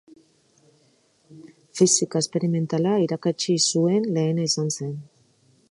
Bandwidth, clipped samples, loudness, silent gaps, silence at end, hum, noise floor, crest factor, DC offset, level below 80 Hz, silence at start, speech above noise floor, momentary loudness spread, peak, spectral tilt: 11.5 kHz; under 0.1%; -22 LUFS; none; 0.65 s; none; -62 dBFS; 20 dB; under 0.1%; -72 dBFS; 1.3 s; 40 dB; 10 LU; -6 dBFS; -4.5 dB/octave